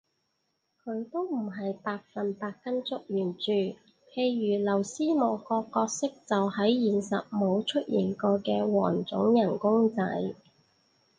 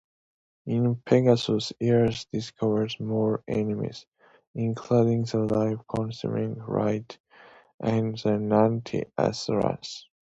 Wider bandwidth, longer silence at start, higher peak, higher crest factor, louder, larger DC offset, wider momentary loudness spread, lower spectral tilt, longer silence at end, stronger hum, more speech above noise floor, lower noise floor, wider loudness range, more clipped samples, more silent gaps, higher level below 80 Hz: first, 9.6 kHz vs 8 kHz; first, 0.85 s vs 0.65 s; second, -12 dBFS vs -6 dBFS; about the same, 18 dB vs 20 dB; second, -29 LUFS vs -26 LUFS; neither; about the same, 10 LU vs 11 LU; second, -5.5 dB/octave vs -7 dB/octave; first, 0.85 s vs 0.35 s; neither; first, 50 dB vs 28 dB; first, -77 dBFS vs -54 dBFS; first, 6 LU vs 3 LU; neither; second, none vs 4.08-4.12 s, 4.47-4.54 s, 7.20-7.24 s, 7.74-7.78 s; second, -72 dBFS vs -58 dBFS